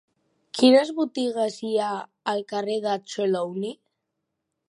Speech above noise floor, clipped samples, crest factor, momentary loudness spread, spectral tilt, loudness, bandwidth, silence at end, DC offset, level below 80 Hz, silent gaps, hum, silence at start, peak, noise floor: 57 dB; under 0.1%; 20 dB; 13 LU; -4.5 dB/octave; -24 LUFS; 11 kHz; 0.95 s; under 0.1%; -82 dBFS; none; none; 0.55 s; -4 dBFS; -80 dBFS